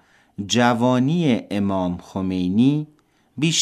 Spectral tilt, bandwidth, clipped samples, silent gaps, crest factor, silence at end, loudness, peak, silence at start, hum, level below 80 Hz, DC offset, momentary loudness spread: -5 dB/octave; 12.5 kHz; under 0.1%; none; 18 dB; 0 s; -20 LUFS; -4 dBFS; 0.4 s; none; -58 dBFS; under 0.1%; 16 LU